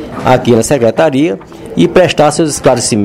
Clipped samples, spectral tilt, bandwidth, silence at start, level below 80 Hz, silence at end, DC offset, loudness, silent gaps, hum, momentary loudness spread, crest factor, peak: 1%; -5 dB/octave; 16 kHz; 0 s; -38 dBFS; 0 s; under 0.1%; -10 LUFS; none; none; 6 LU; 10 dB; 0 dBFS